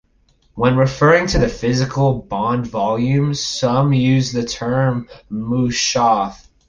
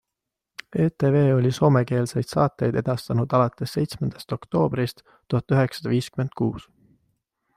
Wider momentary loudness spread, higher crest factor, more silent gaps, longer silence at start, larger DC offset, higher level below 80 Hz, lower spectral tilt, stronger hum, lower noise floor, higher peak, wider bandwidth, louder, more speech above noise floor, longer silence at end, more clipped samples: second, 7 LU vs 10 LU; about the same, 16 dB vs 18 dB; neither; second, 0.55 s vs 0.7 s; neither; first, -36 dBFS vs -54 dBFS; second, -5.5 dB/octave vs -7.5 dB/octave; neither; second, -57 dBFS vs -85 dBFS; first, -2 dBFS vs -6 dBFS; second, 7.8 kHz vs 14.5 kHz; first, -17 LUFS vs -23 LUFS; second, 41 dB vs 62 dB; second, 0.35 s vs 0.95 s; neither